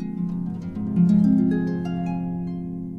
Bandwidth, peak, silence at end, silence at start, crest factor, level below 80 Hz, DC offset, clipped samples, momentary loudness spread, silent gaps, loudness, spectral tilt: 4.4 kHz; -8 dBFS; 0 s; 0 s; 14 dB; -48 dBFS; under 0.1%; under 0.1%; 12 LU; none; -23 LUFS; -10.5 dB/octave